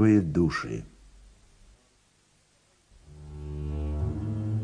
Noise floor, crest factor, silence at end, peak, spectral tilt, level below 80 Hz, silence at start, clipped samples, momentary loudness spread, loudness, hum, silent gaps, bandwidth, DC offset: -65 dBFS; 20 dB; 0 s; -10 dBFS; -8 dB/octave; -42 dBFS; 0 s; under 0.1%; 22 LU; -29 LUFS; none; none; 10.5 kHz; under 0.1%